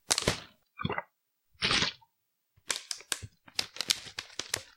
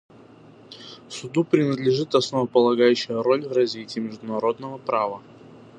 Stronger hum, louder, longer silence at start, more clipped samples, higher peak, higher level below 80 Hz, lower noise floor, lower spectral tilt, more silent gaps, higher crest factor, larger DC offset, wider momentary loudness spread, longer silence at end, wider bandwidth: neither; second, -32 LUFS vs -23 LUFS; second, 0.1 s vs 0.7 s; neither; first, 0 dBFS vs -4 dBFS; first, -56 dBFS vs -70 dBFS; first, -79 dBFS vs -48 dBFS; second, -1.5 dB/octave vs -6 dB/octave; neither; first, 36 dB vs 20 dB; neither; second, 11 LU vs 17 LU; about the same, 0.15 s vs 0.2 s; first, 16.5 kHz vs 9.6 kHz